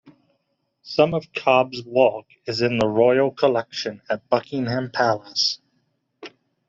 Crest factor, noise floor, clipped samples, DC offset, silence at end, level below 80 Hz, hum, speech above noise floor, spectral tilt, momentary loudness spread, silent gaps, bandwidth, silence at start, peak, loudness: 20 dB; -72 dBFS; under 0.1%; under 0.1%; 0.4 s; -60 dBFS; none; 51 dB; -5 dB/octave; 11 LU; none; 7.6 kHz; 0.05 s; -2 dBFS; -21 LUFS